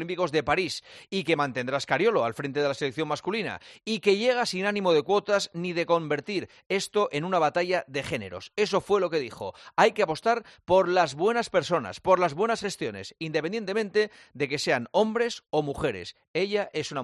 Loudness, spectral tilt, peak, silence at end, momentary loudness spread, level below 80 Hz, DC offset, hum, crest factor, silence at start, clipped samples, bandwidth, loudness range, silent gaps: -27 LUFS; -4.5 dB/octave; -6 dBFS; 0 s; 9 LU; -62 dBFS; under 0.1%; none; 20 dB; 0 s; under 0.1%; 12 kHz; 3 LU; 6.66-6.70 s, 16.28-16.34 s